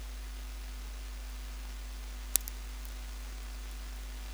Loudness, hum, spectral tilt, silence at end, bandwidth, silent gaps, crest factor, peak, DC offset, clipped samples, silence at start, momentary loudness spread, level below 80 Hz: -40 LUFS; none; -2 dB/octave; 0 s; over 20 kHz; none; 40 dB; 0 dBFS; under 0.1%; under 0.1%; 0 s; 12 LU; -42 dBFS